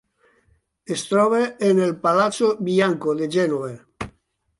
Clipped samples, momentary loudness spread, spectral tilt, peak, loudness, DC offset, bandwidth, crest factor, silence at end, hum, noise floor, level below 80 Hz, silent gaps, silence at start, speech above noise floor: under 0.1%; 16 LU; -5.5 dB/octave; -6 dBFS; -20 LUFS; under 0.1%; 11.5 kHz; 16 dB; 0.5 s; none; -63 dBFS; -58 dBFS; none; 0.9 s; 43 dB